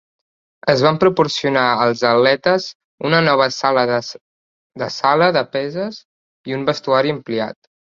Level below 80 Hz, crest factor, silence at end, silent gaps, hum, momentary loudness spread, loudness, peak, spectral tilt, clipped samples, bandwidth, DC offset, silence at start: -60 dBFS; 18 dB; 0.4 s; 2.75-2.98 s, 4.21-4.70 s, 6.05-6.44 s; none; 13 LU; -17 LUFS; 0 dBFS; -5 dB/octave; under 0.1%; 7.6 kHz; under 0.1%; 0.65 s